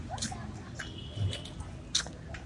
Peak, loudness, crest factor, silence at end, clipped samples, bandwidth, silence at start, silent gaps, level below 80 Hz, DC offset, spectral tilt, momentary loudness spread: -14 dBFS; -37 LUFS; 24 dB; 0 s; under 0.1%; 11.5 kHz; 0 s; none; -50 dBFS; under 0.1%; -3 dB/octave; 11 LU